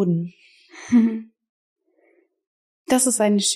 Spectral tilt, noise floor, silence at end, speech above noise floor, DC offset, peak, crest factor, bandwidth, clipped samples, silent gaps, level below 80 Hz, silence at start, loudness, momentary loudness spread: -4 dB/octave; -62 dBFS; 0 s; 43 dB; under 0.1%; -6 dBFS; 16 dB; 15 kHz; under 0.1%; 1.49-1.76 s, 2.47-2.85 s; -68 dBFS; 0 s; -20 LUFS; 17 LU